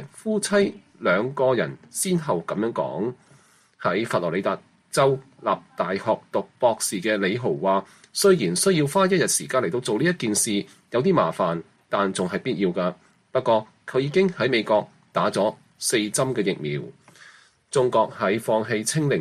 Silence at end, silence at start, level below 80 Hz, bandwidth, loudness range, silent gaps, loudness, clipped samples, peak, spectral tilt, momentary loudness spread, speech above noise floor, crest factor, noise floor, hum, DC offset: 0 s; 0 s; -64 dBFS; 14 kHz; 4 LU; none; -23 LUFS; under 0.1%; -6 dBFS; -4.5 dB/octave; 8 LU; 33 dB; 18 dB; -56 dBFS; none; under 0.1%